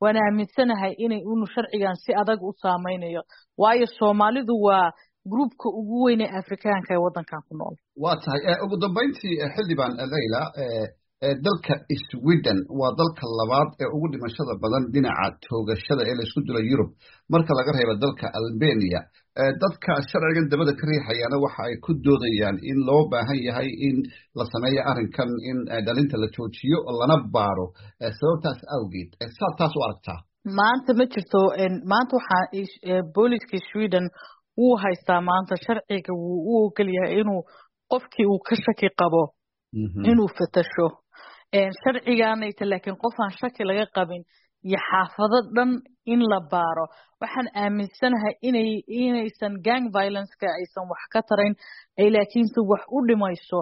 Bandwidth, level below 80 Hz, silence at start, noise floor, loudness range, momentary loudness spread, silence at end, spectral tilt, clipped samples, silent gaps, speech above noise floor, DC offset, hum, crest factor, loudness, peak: 5.8 kHz; -58 dBFS; 0 s; -49 dBFS; 3 LU; 9 LU; 0 s; -5 dB/octave; under 0.1%; none; 26 dB; under 0.1%; none; 18 dB; -24 LUFS; -4 dBFS